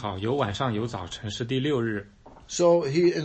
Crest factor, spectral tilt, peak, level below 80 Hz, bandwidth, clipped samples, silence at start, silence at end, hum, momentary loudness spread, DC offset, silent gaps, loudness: 16 dB; -5.5 dB/octave; -10 dBFS; -54 dBFS; 8.6 kHz; under 0.1%; 0 s; 0 s; none; 13 LU; under 0.1%; none; -26 LUFS